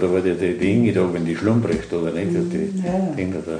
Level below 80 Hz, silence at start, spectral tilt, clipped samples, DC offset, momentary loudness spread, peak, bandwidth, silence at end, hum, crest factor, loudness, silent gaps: -48 dBFS; 0 s; -7.5 dB/octave; under 0.1%; under 0.1%; 6 LU; -4 dBFS; 10 kHz; 0 s; none; 16 dB; -21 LUFS; none